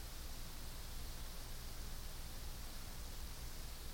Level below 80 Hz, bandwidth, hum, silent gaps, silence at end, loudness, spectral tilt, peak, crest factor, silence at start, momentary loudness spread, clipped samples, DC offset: -48 dBFS; 17 kHz; 60 Hz at -55 dBFS; none; 0 s; -51 LUFS; -3 dB/octave; -36 dBFS; 12 dB; 0 s; 1 LU; under 0.1%; under 0.1%